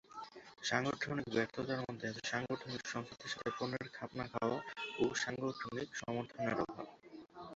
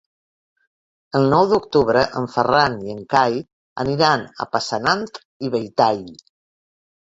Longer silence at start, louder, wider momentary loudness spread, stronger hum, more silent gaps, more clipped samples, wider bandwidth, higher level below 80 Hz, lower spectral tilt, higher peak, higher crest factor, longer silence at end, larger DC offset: second, 0.1 s vs 1.15 s; second, -40 LUFS vs -19 LUFS; about the same, 14 LU vs 12 LU; neither; second, none vs 3.53-3.76 s, 5.25-5.40 s; neither; about the same, 8 kHz vs 8 kHz; second, -72 dBFS vs -54 dBFS; second, -3.5 dB/octave vs -5.5 dB/octave; second, -16 dBFS vs -2 dBFS; first, 24 dB vs 18 dB; second, 0 s vs 0.9 s; neither